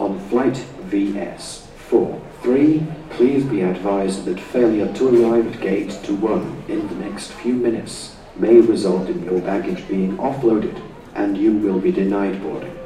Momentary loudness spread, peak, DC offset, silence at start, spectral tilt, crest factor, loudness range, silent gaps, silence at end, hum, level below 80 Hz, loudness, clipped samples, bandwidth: 13 LU; -2 dBFS; under 0.1%; 0 s; -7 dB/octave; 18 dB; 2 LU; none; 0 s; none; -48 dBFS; -19 LUFS; under 0.1%; 11 kHz